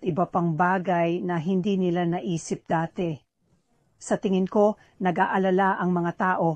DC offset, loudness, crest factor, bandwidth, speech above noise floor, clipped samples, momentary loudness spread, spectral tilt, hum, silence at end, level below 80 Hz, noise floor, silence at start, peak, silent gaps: under 0.1%; -25 LUFS; 16 dB; 9.4 kHz; 44 dB; under 0.1%; 8 LU; -7 dB/octave; none; 0 s; -62 dBFS; -68 dBFS; 0 s; -8 dBFS; none